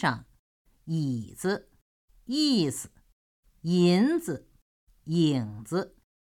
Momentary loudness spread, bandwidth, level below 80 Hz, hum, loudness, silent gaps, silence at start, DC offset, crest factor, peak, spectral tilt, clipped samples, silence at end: 16 LU; 16 kHz; -64 dBFS; none; -28 LUFS; 0.39-0.65 s, 1.82-2.08 s, 3.13-3.43 s, 4.62-4.87 s; 0 s; under 0.1%; 18 dB; -12 dBFS; -5.5 dB/octave; under 0.1%; 0.4 s